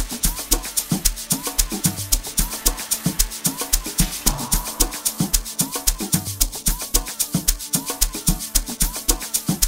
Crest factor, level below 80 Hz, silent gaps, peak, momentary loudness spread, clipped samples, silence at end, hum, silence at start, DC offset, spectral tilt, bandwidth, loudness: 22 dB; -28 dBFS; none; 0 dBFS; 3 LU; under 0.1%; 0 s; none; 0 s; under 0.1%; -2.5 dB/octave; 16.5 kHz; -21 LUFS